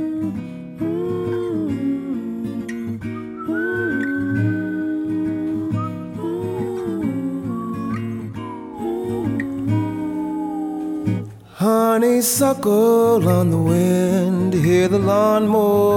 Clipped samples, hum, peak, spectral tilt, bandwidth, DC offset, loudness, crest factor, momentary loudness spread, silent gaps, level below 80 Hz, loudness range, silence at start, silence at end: under 0.1%; none; -4 dBFS; -6.5 dB/octave; 17 kHz; under 0.1%; -20 LUFS; 14 dB; 12 LU; none; -54 dBFS; 9 LU; 0 s; 0 s